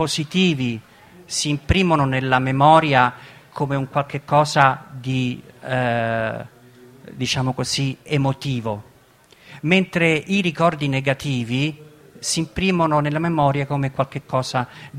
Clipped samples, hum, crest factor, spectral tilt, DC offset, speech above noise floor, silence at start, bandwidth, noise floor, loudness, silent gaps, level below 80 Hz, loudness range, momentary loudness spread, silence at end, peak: under 0.1%; none; 20 dB; -5 dB/octave; under 0.1%; 32 dB; 0 s; 15 kHz; -52 dBFS; -20 LUFS; none; -42 dBFS; 6 LU; 11 LU; 0 s; 0 dBFS